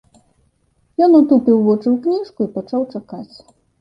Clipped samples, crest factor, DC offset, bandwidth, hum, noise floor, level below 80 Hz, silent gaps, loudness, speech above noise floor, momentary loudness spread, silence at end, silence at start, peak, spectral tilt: under 0.1%; 14 dB; under 0.1%; 5.6 kHz; none; -62 dBFS; -60 dBFS; none; -15 LUFS; 46 dB; 18 LU; 0.55 s; 1 s; -2 dBFS; -9.5 dB/octave